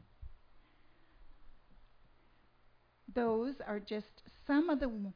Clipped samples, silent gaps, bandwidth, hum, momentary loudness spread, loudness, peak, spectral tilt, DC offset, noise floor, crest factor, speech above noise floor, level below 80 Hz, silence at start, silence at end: under 0.1%; none; 5.2 kHz; none; 26 LU; -36 LUFS; -22 dBFS; -5 dB/octave; under 0.1%; -67 dBFS; 18 dB; 31 dB; -58 dBFS; 0.2 s; 0 s